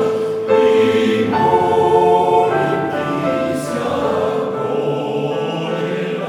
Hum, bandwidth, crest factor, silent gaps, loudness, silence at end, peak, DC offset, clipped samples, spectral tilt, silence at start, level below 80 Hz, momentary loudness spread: none; 13 kHz; 14 dB; none; -16 LUFS; 0 s; -2 dBFS; under 0.1%; under 0.1%; -6 dB/octave; 0 s; -54 dBFS; 8 LU